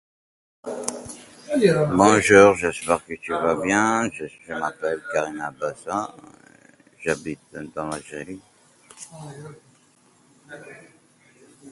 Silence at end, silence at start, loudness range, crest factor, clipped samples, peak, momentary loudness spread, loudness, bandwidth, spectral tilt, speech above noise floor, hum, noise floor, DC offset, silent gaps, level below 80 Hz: 0 s; 0.65 s; 19 LU; 24 dB; under 0.1%; 0 dBFS; 24 LU; -21 LUFS; 11.5 kHz; -4.5 dB/octave; 36 dB; none; -58 dBFS; under 0.1%; none; -56 dBFS